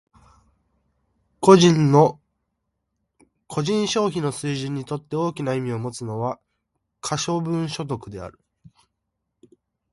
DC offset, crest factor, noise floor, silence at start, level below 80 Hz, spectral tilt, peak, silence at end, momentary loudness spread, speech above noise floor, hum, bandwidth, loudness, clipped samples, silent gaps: under 0.1%; 22 dB; -78 dBFS; 1.4 s; -58 dBFS; -6 dB/octave; 0 dBFS; 1.6 s; 16 LU; 58 dB; none; 11.5 kHz; -21 LUFS; under 0.1%; none